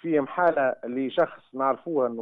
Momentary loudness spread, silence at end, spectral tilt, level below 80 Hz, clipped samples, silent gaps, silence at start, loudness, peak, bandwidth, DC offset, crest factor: 6 LU; 0 s; -8.5 dB/octave; -74 dBFS; under 0.1%; none; 0.05 s; -26 LUFS; -10 dBFS; 4.6 kHz; under 0.1%; 16 dB